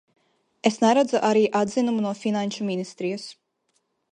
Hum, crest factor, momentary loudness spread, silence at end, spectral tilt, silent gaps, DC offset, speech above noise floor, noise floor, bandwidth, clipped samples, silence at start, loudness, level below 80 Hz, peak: none; 20 dB; 11 LU; 0.8 s; -5 dB/octave; none; under 0.1%; 50 dB; -72 dBFS; 10 kHz; under 0.1%; 0.65 s; -23 LUFS; -72 dBFS; -4 dBFS